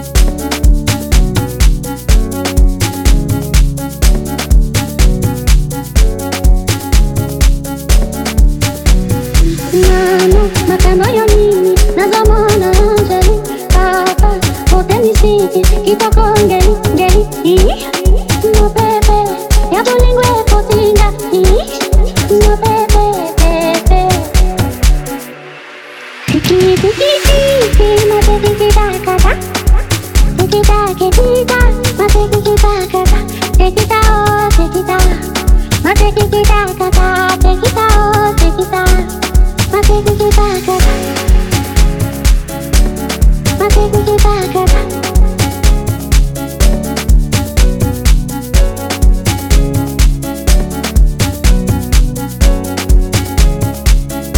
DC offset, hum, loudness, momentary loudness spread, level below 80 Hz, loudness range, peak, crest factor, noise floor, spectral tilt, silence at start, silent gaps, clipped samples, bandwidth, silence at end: under 0.1%; none; -11 LUFS; 5 LU; -12 dBFS; 3 LU; 0 dBFS; 10 dB; -30 dBFS; -5 dB/octave; 0 s; none; under 0.1%; 18 kHz; 0 s